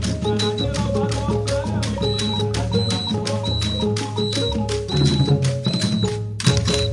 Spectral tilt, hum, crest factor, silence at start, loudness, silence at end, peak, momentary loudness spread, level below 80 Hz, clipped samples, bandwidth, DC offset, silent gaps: -5.5 dB/octave; none; 18 dB; 0 s; -21 LUFS; 0 s; -2 dBFS; 4 LU; -36 dBFS; under 0.1%; 11.5 kHz; under 0.1%; none